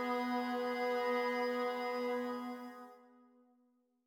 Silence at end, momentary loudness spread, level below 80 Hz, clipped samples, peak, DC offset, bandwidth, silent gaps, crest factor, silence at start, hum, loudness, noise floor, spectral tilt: 1 s; 14 LU; -86 dBFS; under 0.1%; -24 dBFS; under 0.1%; 17 kHz; none; 14 dB; 0 s; none; -37 LUFS; -75 dBFS; -3.5 dB/octave